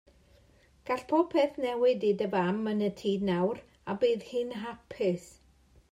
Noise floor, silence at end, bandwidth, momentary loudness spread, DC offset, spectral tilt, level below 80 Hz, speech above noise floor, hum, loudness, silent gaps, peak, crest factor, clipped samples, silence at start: -62 dBFS; 0.65 s; 13 kHz; 12 LU; under 0.1%; -7 dB/octave; -64 dBFS; 33 dB; none; -30 LUFS; none; -14 dBFS; 18 dB; under 0.1%; 0.85 s